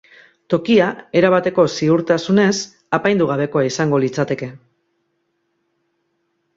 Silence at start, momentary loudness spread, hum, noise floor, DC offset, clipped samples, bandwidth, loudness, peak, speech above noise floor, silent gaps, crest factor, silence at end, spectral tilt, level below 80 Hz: 0.5 s; 8 LU; none; -69 dBFS; under 0.1%; under 0.1%; 7.8 kHz; -17 LUFS; -2 dBFS; 53 dB; none; 16 dB; 2 s; -5.5 dB/octave; -60 dBFS